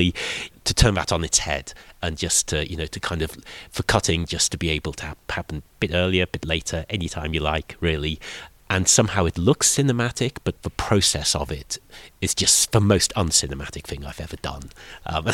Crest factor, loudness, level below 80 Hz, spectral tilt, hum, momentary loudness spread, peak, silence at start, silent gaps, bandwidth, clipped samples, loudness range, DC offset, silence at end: 22 dB; -22 LUFS; -38 dBFS; -3 dB/octave; none; 15 LU; 0 dBFS; 0 s; none; 17 kHz; under 0.1%; 5 LU; under 0.1%; 0 s